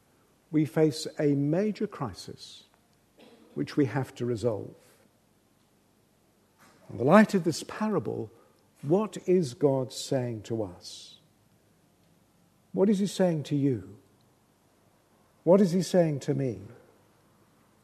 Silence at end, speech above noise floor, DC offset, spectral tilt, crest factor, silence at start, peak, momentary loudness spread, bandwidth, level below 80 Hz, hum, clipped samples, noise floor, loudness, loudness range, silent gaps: 1.1 s; 39 dB; under 0.1%; -6.5 dB/octave; 26 dB; 0.5 s; -4 dBFS; 20 LU; 13.5 kHz; -70 dBFS; none; under 0.1%; -66 dBFS; -28 LUFS; 7 LU; none